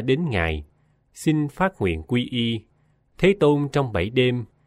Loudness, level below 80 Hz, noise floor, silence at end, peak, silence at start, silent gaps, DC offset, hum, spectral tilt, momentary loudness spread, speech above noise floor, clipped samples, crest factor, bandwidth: -23 LUFS; -42 dBFS; -60 dBFS; 0.2 s; -6 dBFS; 0 s; none; under 0.1%; none; -6.5 dB/octave; 7 LU; 39 dB; under 0.1%; 16 dB; 14.5 kHz